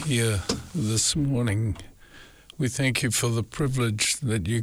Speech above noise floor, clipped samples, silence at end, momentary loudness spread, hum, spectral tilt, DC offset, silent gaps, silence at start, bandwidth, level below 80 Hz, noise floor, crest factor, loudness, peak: 25 dB; under 0.1%; 0 s; 7 LU; none; -4 dB/octave; under 0.1%; none; 0 s; 19.5 kHz; -48 dBFS; -49 dBFS; 14 dB; -25 LUFS; -12 dBFS